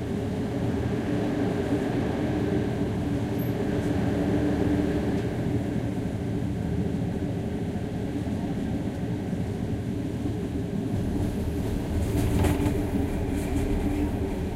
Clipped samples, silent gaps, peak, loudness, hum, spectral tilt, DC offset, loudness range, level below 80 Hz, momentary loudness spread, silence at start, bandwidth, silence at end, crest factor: under 0.1%; none; -10 dBFS; -28 LUFS; none; -7.5 dB/octave; under 0.1%; 3 LU; -36 dBFS; 5 LU; 0 s; 16 kHz; 0 s; 18 dB